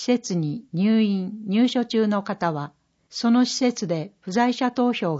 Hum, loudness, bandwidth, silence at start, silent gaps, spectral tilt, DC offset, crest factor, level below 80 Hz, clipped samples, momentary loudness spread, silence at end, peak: none; -23 LUFS; 8 kHz; 0 s; none; -5.5 dB/octave; under 0.1%; 16 dB; -70 dBFS; under 0.1%; 8 LU; 0 s; -8 dBFS